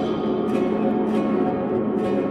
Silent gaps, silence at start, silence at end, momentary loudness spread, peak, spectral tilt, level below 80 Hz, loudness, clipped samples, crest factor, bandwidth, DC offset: none; 0 s; 0 s; 2 LU; -8 dBFS; -8.5 dB/octave; -54 dBFS; -22 LUFS; under 0.1%; 12 dB; 10 kHz; under 0.1%